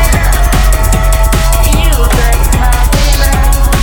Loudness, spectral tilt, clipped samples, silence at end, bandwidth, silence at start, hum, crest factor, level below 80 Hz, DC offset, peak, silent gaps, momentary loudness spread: -10 LUFS; -4 dB/octave; under 0.1%; 0 s; over 20 kHz; 0 s; none; 6 dB; -8 dBFS; under 0.1%; 0 dBFS; none; 1 LU